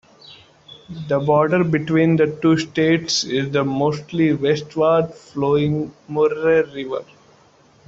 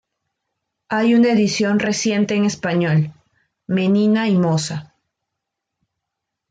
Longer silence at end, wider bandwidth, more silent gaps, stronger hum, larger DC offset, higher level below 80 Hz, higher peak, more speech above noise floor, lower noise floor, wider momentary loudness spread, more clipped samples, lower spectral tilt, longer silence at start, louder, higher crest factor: second, 0.85 s vs 1.65 s; second, 7.8 kHz vs 9.2 kHz; neither; neither; neither; first, -56 dBFS vs -62 dBFS; about the same, -4 dBFS vs -6 dBFS; second, 34 dB vs 64 dB; second, -53 dBFS vs -81 dBFS; about the same, 10 LU vs 9 LU; neither; about the same, -6 dB/octave vs -5.5 dB/octave; second, 0.3 s vs 0.9 s; about the same, -19 LUFS vs -18 LUFS; about the same, 16 dB vs 14 dB